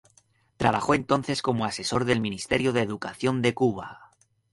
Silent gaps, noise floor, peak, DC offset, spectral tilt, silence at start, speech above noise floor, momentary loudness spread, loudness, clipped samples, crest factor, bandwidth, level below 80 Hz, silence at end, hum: none; -63 dBFS; -6 dBFS; under 0.1%; -5 dB/octave; 0.6 s; 38 dB; 5 LU; -26 LUFS; under 0.1%; 22 dB; 11.5 kHz; -54 dBFS; 0.45 s; none